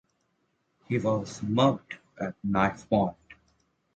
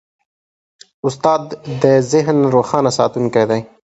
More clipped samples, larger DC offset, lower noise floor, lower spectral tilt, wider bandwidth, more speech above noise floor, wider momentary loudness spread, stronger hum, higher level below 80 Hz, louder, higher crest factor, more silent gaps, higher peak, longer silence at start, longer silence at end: neither; neither; second, -74 dBFS vs under -90 dBFS; about the same, -6.5 dB/octave vs -6 dB/octave; about the same, 8.8 kHz vs 8.2 kHz; second, 47 dB vs over 75 dB; first, 12 LU vs 7 LU; neither; about the same, -56 dBFS vs -54 dBFS; second, -28 LUFS vs -15 LUFS; about the same, 20 dB vs 16 dB; neither; second, -10 dBFS vs 0 dBFS; second, 0.9 s vs 1.05 s; first, 0.65 s vs 0.2 s